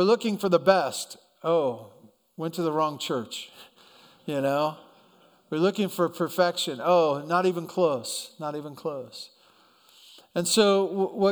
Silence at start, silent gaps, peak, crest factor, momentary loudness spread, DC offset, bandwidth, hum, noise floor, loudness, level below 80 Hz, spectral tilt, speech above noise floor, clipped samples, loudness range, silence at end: 0 s; none; -4 dBFS; 22 dB; 15 LU; under 0.1%; over 20 kHz; none; -60 dBFS; -26 LUFS; -76 dBFS; -4.5 dB/octave; 34 dB; under 0.1%; 5 LU; 0 s